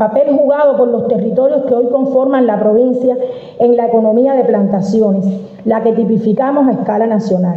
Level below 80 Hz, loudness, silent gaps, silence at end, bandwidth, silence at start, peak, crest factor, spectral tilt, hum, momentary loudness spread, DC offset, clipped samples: -58 dBFS; -12 LUFS; none; 0 s; 7.6 kHz; 0 s; -2 dBFS; 10 dB; -9.5 dB/octave; none; 4 LU; under 0.1%; under 0.1%